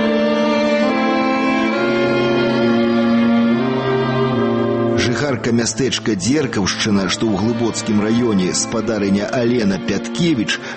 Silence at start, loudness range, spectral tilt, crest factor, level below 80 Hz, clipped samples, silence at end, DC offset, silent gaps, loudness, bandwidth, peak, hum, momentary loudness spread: 0 s; 2 LU; -5 dB/octave; 12 dB; -48 dBFS; under 0.1%; 0 s; under 0.1%; none; -17 LUFS; 8.8 kHz; -6 dBFS; none; 3 LU